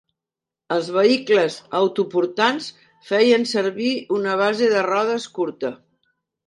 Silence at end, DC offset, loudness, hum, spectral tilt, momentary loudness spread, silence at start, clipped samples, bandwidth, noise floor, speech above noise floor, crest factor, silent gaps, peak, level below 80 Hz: 0.7 s; under 0.1%; -20 LUFS; none; -4.5 dB/octave; 9 LU; 0.7 s; under 0.1%; 11.5 kHz; -88 dBFS; 68 dB; 16 dB; none; -4 dBFS; -74 dBFS